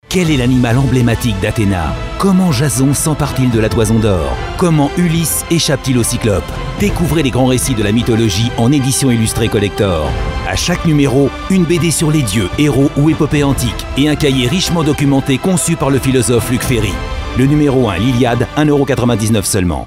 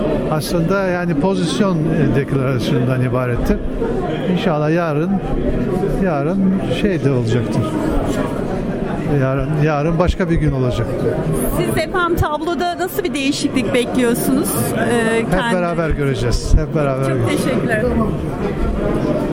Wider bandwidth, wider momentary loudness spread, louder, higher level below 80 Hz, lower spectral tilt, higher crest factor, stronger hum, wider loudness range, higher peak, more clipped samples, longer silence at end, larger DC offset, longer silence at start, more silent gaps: about the same, 16.5 kHz vs 16.5 kHz; about the same, 4 LU vs 4 LU; first, -13 LUFS vs -18 LUFS; about the same, -26 dBFS vs -28 dBFS; about the same, -5.5 dB/octave vs -6.5 dB/octave; about the same, 12 dB vs 14 dB; neither; about the same, 1 LU vs 1 LU; about the same, 0 dBFS vs -2 dBFS; neither; about the same, 0 s vs 0 s; neither; about the same, 0.1 s vs 0 s; neither